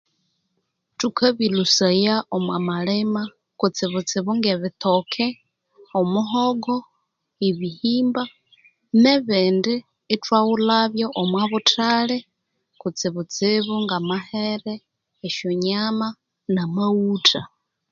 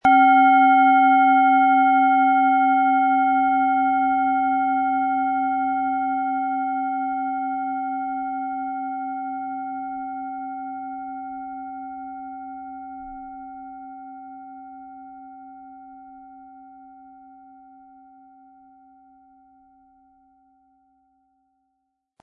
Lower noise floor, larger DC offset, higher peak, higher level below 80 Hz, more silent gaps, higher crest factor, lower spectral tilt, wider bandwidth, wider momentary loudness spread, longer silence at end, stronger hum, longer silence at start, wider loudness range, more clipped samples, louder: about the same, -74 dBFS vs -76 dBFS; neither; first, 0 dBFS vs -6 dBFS; about the same, -66 dBFS vs -62 dBFS; neither; first, 22 dB vs 16 dB; second, -4.5 dB/octave vs -6 dB/octave; first, 7.6 kHz vs 3.3 kHz; second, 10 LU vs 24 LU; second, 0.45 s vs 5.55 s; neither; first, 1 s vs 0.05 s; second, 4 LU vs 24 LU; neither; about the same, -21 LUFS vs -20 LUFS